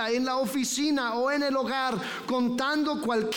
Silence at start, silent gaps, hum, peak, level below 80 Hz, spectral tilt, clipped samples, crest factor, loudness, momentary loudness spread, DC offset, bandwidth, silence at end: 0 s; none; none; -16 dBFS; -66 dBFS; -3 dB/octave; under 0.1%; 12 dB; -27 LUFS; 2 LU; under 0.1%; 19 kHz; 0 s